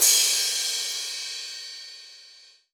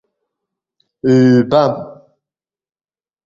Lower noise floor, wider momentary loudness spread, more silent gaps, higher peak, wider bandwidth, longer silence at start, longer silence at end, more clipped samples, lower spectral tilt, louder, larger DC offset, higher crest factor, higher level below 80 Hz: second, -52 dBFS vs under -90 dBFS; first, 22 LU vs 16 LU; neither; second, -6 dBFS vs -2 dBFS; first, over 20 kHz vs 7.4 kHz; second, 0 s vs 1.05 s; second, 0.45 s vs 1.3 s; neither; second, 4.5 dB/octave vs -8 dB/octave; second, -23 LUFS vs -13 LUFS; neither; about the same, 20 dB vs 16 dB; second, -72 dBFS vs -54 dBFS